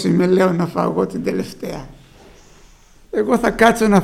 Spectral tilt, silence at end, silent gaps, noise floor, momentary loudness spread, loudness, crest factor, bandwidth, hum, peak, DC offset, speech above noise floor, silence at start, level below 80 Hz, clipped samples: -6.5 dB/octave; 0 s; none; -46 dBFS; 15 LU; -17 LUFS; 18 dB; 15.5 kHz; none; 0 dBFS; under 0.1%; 30 dB; 0 s; -42 dBFS; under 0.1%